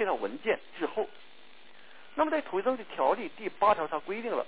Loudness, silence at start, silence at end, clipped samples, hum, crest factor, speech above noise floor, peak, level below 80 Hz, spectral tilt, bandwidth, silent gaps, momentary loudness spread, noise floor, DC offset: -31 LUFS; 0 s; 0 s; under 0.1%; none; 20 dB; 26 dB; -12 dBFS; -70 dBFS; -2 dB/octave; 4 kHz; none; 9 LU; -57 dBFS; 0.4%